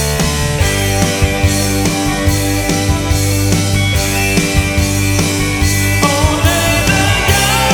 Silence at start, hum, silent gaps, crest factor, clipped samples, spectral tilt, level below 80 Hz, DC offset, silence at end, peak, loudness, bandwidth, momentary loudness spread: 0 s; none; none; 12 dB; under 0.1%; -4 dB/octave; -22 dBFS; under 0.1%; 0 s; 0 dBFS; -13 LUFS; 19.5 kHz; 3 LU